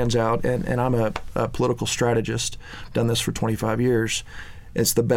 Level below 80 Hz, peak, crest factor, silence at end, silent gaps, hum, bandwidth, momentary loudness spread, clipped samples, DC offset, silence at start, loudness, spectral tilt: -40 dBFS; -6 dBFS; 16 dB; 0 s; none; none; 17 kHz; 8 LU; under 0.1%; under 0.1%; 0 s; -23 LUFS; -5 dB/octave